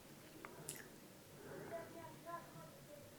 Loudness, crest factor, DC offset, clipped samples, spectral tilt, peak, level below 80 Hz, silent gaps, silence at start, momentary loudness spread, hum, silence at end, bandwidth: -54 LUFS; 26 dB; under 0.1%; under 0.1%; -4 dB/octave; -28 dBFS; -78 dBFS; none; 0 s; 7 LU; none; 0 s; over 20 kHz